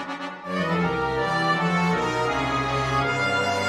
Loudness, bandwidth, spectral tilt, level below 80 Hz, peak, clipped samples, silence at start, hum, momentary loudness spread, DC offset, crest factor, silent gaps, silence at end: -24 LUFS; 13 kHz; -5.5 dB/octave; -46 dBFS; -10 dBFS; under 0.1%; 0 s; none; 5 LU; under 0.1%; 14 dB; none; 0 s